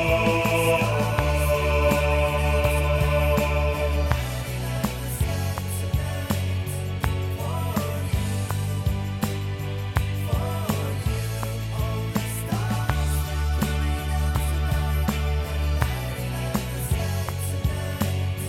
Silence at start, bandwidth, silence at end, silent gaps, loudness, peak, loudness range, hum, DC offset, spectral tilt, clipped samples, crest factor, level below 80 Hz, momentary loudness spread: 0 s; 16.5 kHz; 0 s; none; -25 LUFS; -2 dBFS; 5 LU; none; under 0.1%; -5.5 dB/octave; under 0.1%; 22 dB; -30 dBFS; 7 LU